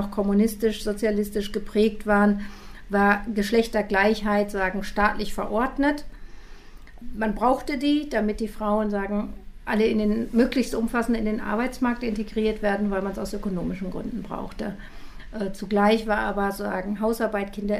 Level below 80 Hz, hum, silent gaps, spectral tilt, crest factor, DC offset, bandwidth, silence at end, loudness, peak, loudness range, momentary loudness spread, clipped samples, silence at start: -40 dBFS; none; none; -6 dB/octave; 18 dB; under 0.1%; 15.5 kHz; 0 s; -25 LUFS; -6 dBFS; 5 LU; 11 LU; under 0.1%; 0 s